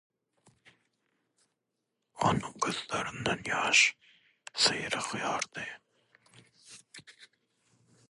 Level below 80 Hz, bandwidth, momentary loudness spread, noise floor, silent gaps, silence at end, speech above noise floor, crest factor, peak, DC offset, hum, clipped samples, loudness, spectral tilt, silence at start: -64 dBFS; 11.5 kHz; 26 LU; -84 dBFS; none; 0.85 s; 53 dB; 24 dB; -10 dBFS; under 0.1%; none; under 0.1%; -29 LUFS; -2 dB/octave; 2.15 s